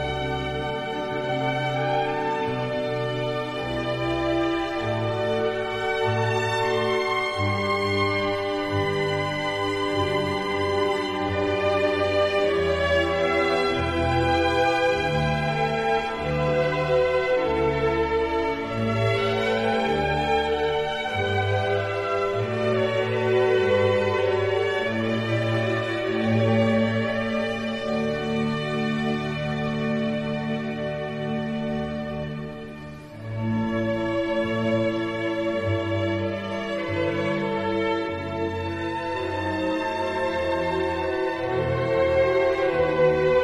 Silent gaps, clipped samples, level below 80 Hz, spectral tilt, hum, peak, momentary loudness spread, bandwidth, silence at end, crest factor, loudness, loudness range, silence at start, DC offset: none; under 0.1%; -46 dBFS; -6.5 dB/octave; none; -8 dBFS; 7 LU; 13 kHz; 0 s; 16 dB; -24 LUFS; 4 LU; 0 s; under 0.1%